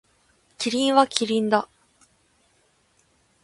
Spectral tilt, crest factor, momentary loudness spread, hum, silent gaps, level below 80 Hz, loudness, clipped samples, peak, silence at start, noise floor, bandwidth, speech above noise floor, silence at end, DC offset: -3.5 dB/octave; 24 dB; 10 LU; none; none; -70 dBFS; -22 LUFS; under 0.1%; -2 dBFS; 0.6 s; -64 dBFS; 11.5 kHz; 43 dB; 1.8 s; under 0.1%